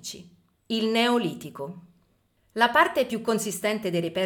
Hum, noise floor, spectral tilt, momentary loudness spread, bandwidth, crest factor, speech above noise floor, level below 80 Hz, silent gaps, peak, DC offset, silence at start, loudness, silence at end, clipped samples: none; -67 dBFS; -4 dB/octave; 18 LU; 19 kHz; 20 dB; 42 dB; -68 dBFS; none; -6 dBFS; under 0.1%; 0.05 s; -24 LUFS; 0 s; under 0.1%